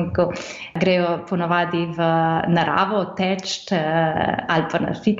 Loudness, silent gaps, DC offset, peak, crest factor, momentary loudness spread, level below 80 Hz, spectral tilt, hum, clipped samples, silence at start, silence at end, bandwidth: -21 LUFS; none; under 0.1%; -6 dBFS; 16 dB; 5 LU; -52 dBFS; -6 dB/octave; none; under 0.1%; 0 s; 0 s; 7.8 kHz